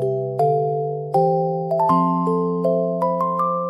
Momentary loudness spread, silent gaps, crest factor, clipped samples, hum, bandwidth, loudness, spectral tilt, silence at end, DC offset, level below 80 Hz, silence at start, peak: 4 LU; none; 14 dB; under 0.1%; none; 11.5 kHz; -20 LUFS; -10 dB/octave; 0 s; under 0.1%; -64 dBFS; 0 s; -6 dBFS